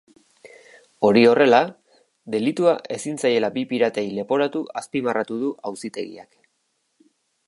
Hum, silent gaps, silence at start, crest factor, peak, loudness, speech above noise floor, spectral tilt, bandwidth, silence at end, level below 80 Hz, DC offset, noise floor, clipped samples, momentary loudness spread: none; none; 0.45 s; 20 dB; -2 dBFS; -21 LUFS; 51 dB; -5 dB/octave; 11.5 kHz; 1.25 s; -70 dBFS; under 0.1%; -71 dBFS; under 0.1%; 16 LU